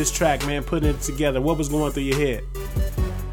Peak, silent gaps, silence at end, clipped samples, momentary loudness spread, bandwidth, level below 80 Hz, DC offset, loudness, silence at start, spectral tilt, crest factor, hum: -6 dBFS; none; 0 s; under 0.1%; 6 LU; 18.5 kHz; -28 dBFS; under 0.1%; -23 LUFS; 0 s; -5 dB/octave; 16 dB; none